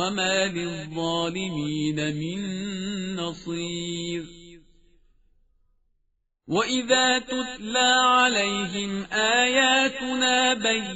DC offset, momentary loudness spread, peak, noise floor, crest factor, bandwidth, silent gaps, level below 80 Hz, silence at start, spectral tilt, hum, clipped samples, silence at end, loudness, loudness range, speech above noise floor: under 0.1%; 12 LU; -6 dBFS; -73 dBFS; 18 dB; 8 kHz; none; -56 dBFS; 0 s; -1.5 dB/octave; none; under 0.1%; 0 s; -23 LUFS; 13 LU; 48 dB